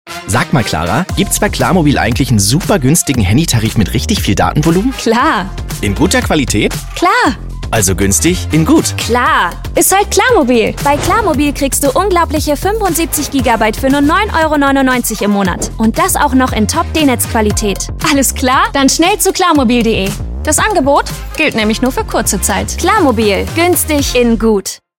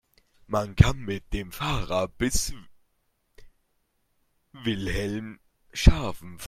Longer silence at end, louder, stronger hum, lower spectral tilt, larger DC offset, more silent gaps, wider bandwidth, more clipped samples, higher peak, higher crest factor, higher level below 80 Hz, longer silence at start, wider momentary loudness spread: first, 0.2 s vs 0 s; first, -11 LUFS vs -27 LUFS; neither; about the same, -4 dB/octave vs -5 dB/octave; neither; neither; about the same, 17 kHz vs 16 kHz; neither; about the same, 0 dBFS vs 0 dBFS; second, 12 dB vs 26 dB; first, -26 dBFS vs -32 dBFS; second, 0.05 s vs 0.5 s; second, 5 LU vs 13 LU